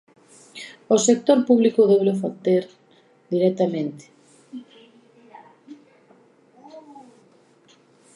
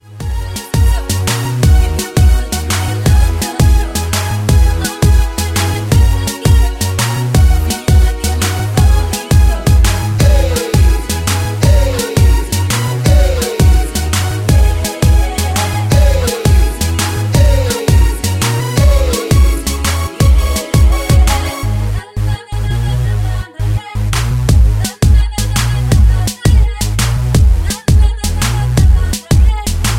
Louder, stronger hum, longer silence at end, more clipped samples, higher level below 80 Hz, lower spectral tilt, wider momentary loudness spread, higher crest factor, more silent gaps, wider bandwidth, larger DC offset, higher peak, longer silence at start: second, -20 LUFS vs -13 LUFS; neither; first, 1.35 s vs 0 s; neither; second, -78 dBFS vs -14 dBFS; about the same, -5.5 dB/octave vs -5 dB/octave; first, 25 LU vs 5 LU; first, 20 dB vs 10 dB; neither; second, 11 kHz vs 16.5 kHz; neither; second, -4 dBFS vs 0 dBFS; first, 0.55 s vs 0.1 s